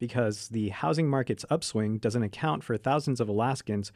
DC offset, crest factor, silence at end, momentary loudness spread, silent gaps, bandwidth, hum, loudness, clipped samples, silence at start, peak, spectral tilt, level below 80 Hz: under 0.1%; 14 dB; 0.05 s; 3 LU; none; 13 kHz; none; -29 LUFS; under 0.1%; 0 s; -14 dBFS; -6 dB/octave; -64 dBFS